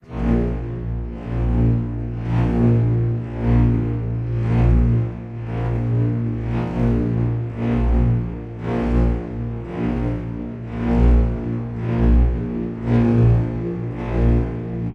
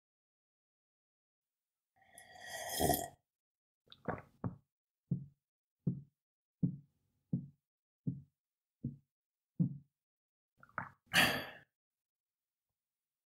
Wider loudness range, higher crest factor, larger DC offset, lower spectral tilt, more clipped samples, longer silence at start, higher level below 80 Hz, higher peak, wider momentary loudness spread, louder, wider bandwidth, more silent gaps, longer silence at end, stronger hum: second, 3 LU vs 8 LU; second, 14 dB vs 28 dB; neither; first, -10.5 dB/octave vs -4 dB/octave; neither; second, 0.1 s vs 2.15 s; first, -24 dBFS vs -66 dBFS; first, -6 dBFS vs -16 dBFS; second, 10 LU vs 21 LU; first, -21 LUFS vs -39 LUFS; second, 4.2 kHz vs 15.5 kHz; second, none vs 3.35-3.85 s, 4.72-5.04 s, 5.48-5.77 s, 6.22-6.59 s, 7.67-8.04 s, 8.38-8.51 s, 9.11-9.49 s, 10.02-10.57 s; second, 0 s vs 1.65 s; neither